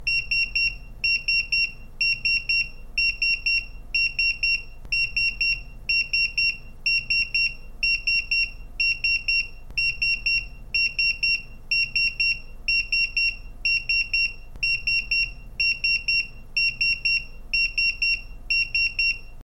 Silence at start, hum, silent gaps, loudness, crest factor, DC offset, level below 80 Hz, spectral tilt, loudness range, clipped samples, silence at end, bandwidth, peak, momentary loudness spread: 0 s; none; none; -22 LUFS; 14 dB; under 0.1%; -40 dBFS; -1 dB/octave; 0 LU; under 0.1%; 0 s; 16 kHz; -12 dBFS; 6 LU